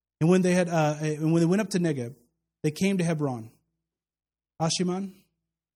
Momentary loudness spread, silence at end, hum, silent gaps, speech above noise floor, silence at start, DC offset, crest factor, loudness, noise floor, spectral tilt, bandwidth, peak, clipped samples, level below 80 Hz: 11 LU; 0.65 s; none; none; over 65 dB; 0.2 s; under 0.1%; 18 dB; -26 LUFS; under -90 dBFS; -6 dB/octave; 14.5 kHz; -10 dBFS; under 0.1%; -68 dBFS